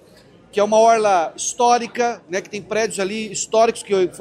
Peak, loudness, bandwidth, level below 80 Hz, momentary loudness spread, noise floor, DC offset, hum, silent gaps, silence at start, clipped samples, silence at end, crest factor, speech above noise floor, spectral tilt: -2 dBFS; -19 LUFS; 13 kHz; -62 dBFS; 11 LU; -48 dBFS; under 0.1%; none; none; 0.55 s; under 0.1%; 0 s; 16 dB; 30 dB; -3 dB/octave